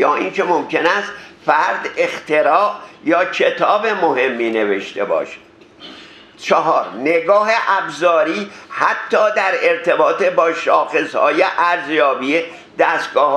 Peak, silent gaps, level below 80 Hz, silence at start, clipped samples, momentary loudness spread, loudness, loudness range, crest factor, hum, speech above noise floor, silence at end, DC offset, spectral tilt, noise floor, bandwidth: 0 dBFS; none; -68 dBFS; 0 s; under 0.1%; 6 LU; -16 LUFS; 3 LU; 16 dB; none; 24 dB; 0 s; under 0.1%; -4 dB/octave; -39 dBFS; 10.5 kHz